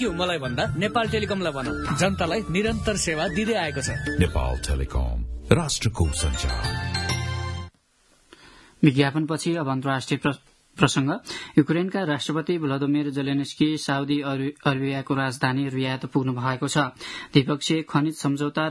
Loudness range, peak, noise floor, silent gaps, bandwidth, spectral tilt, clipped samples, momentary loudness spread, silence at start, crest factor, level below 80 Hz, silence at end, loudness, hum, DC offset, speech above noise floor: 2 LU; -2 dBFS; -62 dBFS; none; 12 kHz; -5 dB/octave; under 0.1%; 6 LU; 0 s; 24 dB; -36 dBFS; 0 s; -25 LUFS; none; under 0.1%; 38 dB